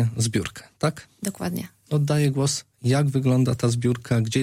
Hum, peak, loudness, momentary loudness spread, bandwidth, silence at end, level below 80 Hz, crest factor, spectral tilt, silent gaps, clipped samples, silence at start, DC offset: none; -8 dBFS; -24 LUFS; 9 LU; 16 kHz; 0 s; -54 dBFS; 16 dB; -6 dB/octave; none; under 0.1%; 0 s; under 0.1%